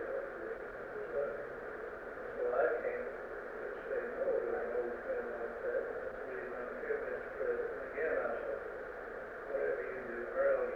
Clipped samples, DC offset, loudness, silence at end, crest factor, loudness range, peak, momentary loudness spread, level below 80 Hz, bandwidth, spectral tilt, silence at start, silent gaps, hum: under 0.1%; under 0.1%; -39 LUFS; 0 s; 18 dB; 2 LU; -20 dBFS; 10 LU; -64 dBFS; 6.6 kHz; -6.5 dB/octave; 0 s; none; none